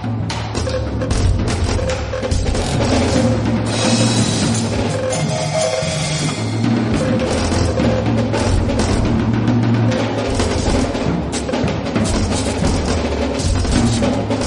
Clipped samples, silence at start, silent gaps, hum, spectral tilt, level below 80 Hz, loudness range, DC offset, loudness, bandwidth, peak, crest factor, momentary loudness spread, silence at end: under 0.1%; 0 s; none; none; -5.5 dB/octave; -26 dBFS; 2 LU; under 0.1%; -17 LUFS; 11 kHz; -2 dBFS; 14 dB; 4 LU; 0 s